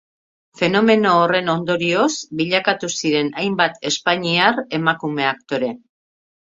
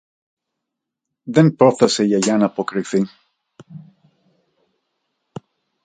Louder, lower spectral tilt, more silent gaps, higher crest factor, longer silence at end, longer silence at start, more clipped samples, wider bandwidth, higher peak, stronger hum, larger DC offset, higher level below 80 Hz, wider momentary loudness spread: about the same, -18 LUFS vs -17 LUFS; second, -4 dB/octave vs -5.5 dB/octave; neither; about the same, 20 dB vs 20 dB; second, 0.75 s vs 2.05 s; second, 0.55 s vs 1.25 s; neither; second, 8 kHz vs 9.4 kHz; about the same, 0 dBFS vs 0 dBFS; neither; neither; about the same, -62 dBFS vs -64 dBFS; second, 8 LU vs 25 LU